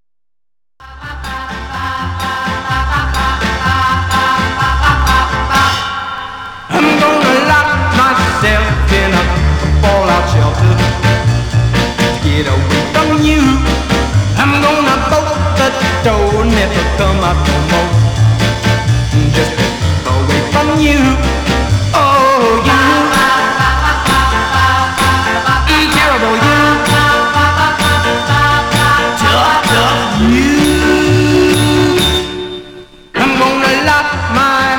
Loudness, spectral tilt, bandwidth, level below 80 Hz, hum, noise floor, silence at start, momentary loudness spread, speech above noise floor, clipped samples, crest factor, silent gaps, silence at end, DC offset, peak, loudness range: -11 LUFS; -5 dB/octave; 19 kHz; -20 dBFS; none; -89 dBFS; 0.8 s; 6 LU; 79 dB; under 0.1%; 10 dB; none; 0 s; 0.2%; 0 dBFS; 3 LU